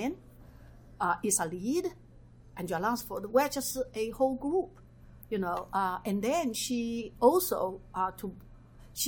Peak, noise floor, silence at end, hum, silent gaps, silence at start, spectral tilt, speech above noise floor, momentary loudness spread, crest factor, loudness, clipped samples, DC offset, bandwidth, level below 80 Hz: -12 dBFS; -54 dBFS; 0 s; none; none; 0 s; -4 dB/octave; 23 dB; 12 LU; 22 dB; -31 LUFS; under 0.1%; under 0.1%; over 20 kHz; -56 dBFS